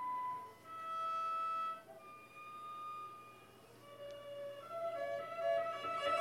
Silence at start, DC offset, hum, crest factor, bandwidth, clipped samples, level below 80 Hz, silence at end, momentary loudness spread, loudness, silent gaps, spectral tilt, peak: 0 s; under 0.1%; none; 18 dB; 16.5 kHz; under 0.1%; -84 dBFS; 0 s; 17 LU; -42 LUFS; none; -3.5 dB/octave; -26 dBFS